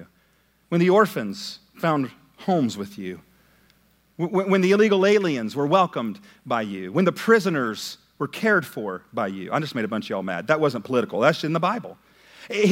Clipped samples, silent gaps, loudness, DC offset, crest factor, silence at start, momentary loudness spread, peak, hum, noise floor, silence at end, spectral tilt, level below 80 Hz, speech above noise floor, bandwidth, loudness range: under 0.1%; none; -23 LUFS; under 0.1%; 20 dB; 0 s; 14 LU; -2 dBFS; none; -63 dBFS; 0 s; -6 dB/octave; -70 dBFS; 40 dB; 16.5 kHz; 4 LU